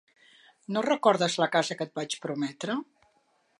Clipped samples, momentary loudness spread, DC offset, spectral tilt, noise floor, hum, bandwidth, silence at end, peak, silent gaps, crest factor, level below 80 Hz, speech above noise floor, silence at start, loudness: under 0.1%; 10 LU; under 0.1%; -4 dB/octave; -69 dBFS; none; 11.5 kHz; 0.75 s; -8 dBFS; none; 22 dB; -80 dBFS; 42 dB; 0.7 s; -28 LUFS